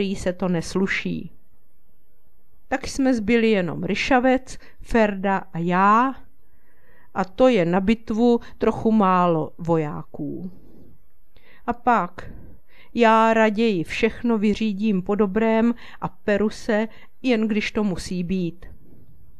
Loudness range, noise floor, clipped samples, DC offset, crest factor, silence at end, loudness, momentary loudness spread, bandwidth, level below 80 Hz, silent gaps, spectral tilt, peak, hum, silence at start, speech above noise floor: 4 LU; -63 dBFS; under 0.1%; 2%; 18 dB; 0.65 s; -21 LUFS; 14 LU; 12 kHz; -44 dBFS; none; -6.5 dB/octave; -4 dBFS; none; 0 s; 42 dB